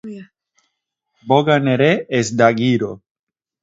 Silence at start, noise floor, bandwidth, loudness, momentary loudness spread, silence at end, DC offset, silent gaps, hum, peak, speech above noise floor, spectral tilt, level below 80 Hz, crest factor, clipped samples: 0.05 s; -75 dBFS; 7.8 kHz; -16 LUFS; 13 LU; 0.65 s; under 0.1%; none; none; 0 dBFS; 59 dB; -6 dB/octave; -60 dBFS; 18 dB; under 0.1%